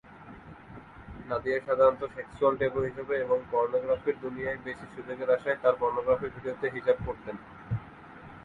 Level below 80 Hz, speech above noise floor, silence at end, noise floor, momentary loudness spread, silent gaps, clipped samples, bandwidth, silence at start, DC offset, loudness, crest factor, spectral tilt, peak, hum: -56 dBFS; 19 dB; 0 s; -48 dBFS; 22 LU; none; under 0.1%; 7.2 kHz; 0.1 s; under 0.1%; -29 LUFS; 20 dB; -8 dB/octave; -10 dBFS; none